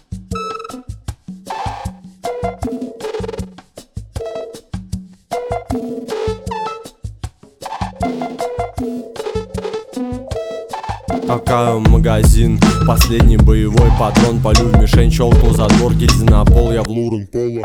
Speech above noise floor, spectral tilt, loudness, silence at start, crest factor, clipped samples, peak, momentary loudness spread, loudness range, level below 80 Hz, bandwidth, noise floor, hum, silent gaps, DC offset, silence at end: 28 dB; -6.5 dB/octave; -15 LUFS; 0.1 s; 14 dB; under 0.1%; 0 dBFS; 18 LU; 14 LU; -18 dBFS; 17 kHz; -39 dBFS; none; none; under 0.1%; 0 s